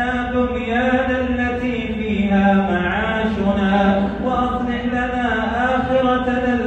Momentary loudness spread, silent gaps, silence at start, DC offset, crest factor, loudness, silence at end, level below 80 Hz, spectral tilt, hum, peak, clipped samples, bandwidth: 5 LU; none; 0 s; under 0.1%; 14 dB; -19 LUFS; 0 s; -34 dBFS; -7.5 dB/octave; none; -4 dBFS; under 0.1%; 8.2 kHz